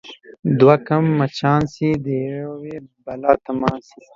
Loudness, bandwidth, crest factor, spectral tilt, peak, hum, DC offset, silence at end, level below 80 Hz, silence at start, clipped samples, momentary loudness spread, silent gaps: -18 LUFS; 7.6 kHz; 18 dB; -8 dB/octave; 0 dBFS; none; under 0.1%; 0.35 s; -52 dBFS; 0.05 s; under 0.1%; 20 LU; 0.39-0.43 s